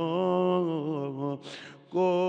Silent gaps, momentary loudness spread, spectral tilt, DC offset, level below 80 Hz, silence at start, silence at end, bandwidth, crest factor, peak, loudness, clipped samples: none; 14 LU; -8 dB/octave; under 0.1%; -86 dBFS; 0 s; 0 s; 8.4 kHz; 14 dB; -14 dBFS; -29 LUFS; under 0.1%